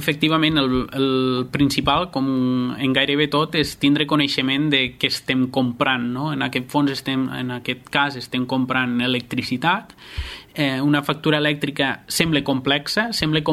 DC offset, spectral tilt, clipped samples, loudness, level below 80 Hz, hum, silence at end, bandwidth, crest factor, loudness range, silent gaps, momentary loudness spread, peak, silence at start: under 0.1%; -5 dB/octave; under 0.1%; -20 LUFS; -46 dBFS; none; 0 s; 15.5 kHz; 18 dB; 3 LU; none; 6 LU; -2 dBFS; 0 s